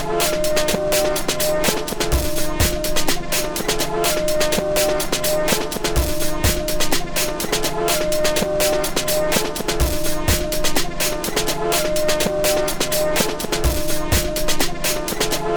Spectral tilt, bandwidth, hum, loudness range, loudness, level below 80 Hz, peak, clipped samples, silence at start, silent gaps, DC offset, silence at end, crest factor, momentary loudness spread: -3 dB/octave; over 20 kHz; none; 1 LU; -20 LUFS; -28 dBFS; -2 dBFS; under 0.1%; 0 s; none; under 0.1%; 0 s; 16 dB; 3 LU